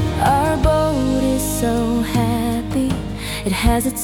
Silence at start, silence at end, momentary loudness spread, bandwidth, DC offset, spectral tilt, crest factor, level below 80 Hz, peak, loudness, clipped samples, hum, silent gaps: 0 s; 0 s; 6 LU; 18 kHz; under 0.1%; -5.5 dB/octave; 14 dB; -28 dBFS; -4 dBFS; -18 LUFS; under 0.1%; none; none